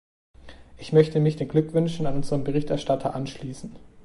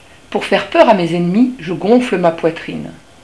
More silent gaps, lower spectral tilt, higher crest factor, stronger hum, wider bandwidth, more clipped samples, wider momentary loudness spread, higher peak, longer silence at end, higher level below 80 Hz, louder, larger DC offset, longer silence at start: neither; about the same, -7.5 dB/octave vs -6.5 dB/octave; first, 20 dB vs 14 dB; neither; about the same, 11.5 kHz vs 11 kHz; second, under 0.1% vs 0.3%; about the same, 16 LU vs 15 LU; second, -6 dBFS vs 0 dBFS; second, 0.05 s vs 0.3 s; about the same, -48 dBFS vs -50 dBFS; second, -24 LUFS vs -14 LUFS; second, under 0.1% vs 0.4%; first, 0.45 s vs 0.3 s